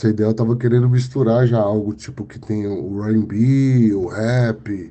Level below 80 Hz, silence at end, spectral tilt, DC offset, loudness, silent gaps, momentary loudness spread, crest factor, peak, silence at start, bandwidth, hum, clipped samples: -50 dBFS; 0 s; -9 dB/octave; under 0.1%; -18 LUFS; none; 11 LU; 12 dB; -4 dBFS; 0 s; 8.4 kHz; none; under 0.1%